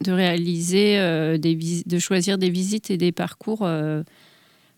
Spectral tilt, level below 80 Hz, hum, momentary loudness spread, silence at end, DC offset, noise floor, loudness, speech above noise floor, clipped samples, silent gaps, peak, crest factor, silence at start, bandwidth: -5 dB/octave; -76 dBFS; none; 9 LU; 0.7 s; under 0.1%; -56 dBFS; -22 LUFS; 35 dB; under 0.1%; none; -6 dBFS; 16 dB; 0 s; 16.5 kHz